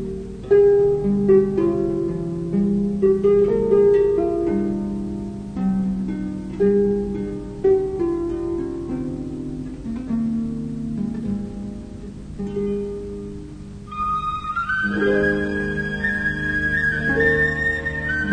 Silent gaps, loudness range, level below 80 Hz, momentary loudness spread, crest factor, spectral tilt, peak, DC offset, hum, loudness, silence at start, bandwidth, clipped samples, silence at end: none; 9 LU; -38 dBFS; 14 LU; 16 dB; -8 dB/octave; -6 dBFS; under 0.1%; 50 Hz at -35 dBFS; -21 LUFS; 0 s; 9.4 kHz; under 0.1%; 0 s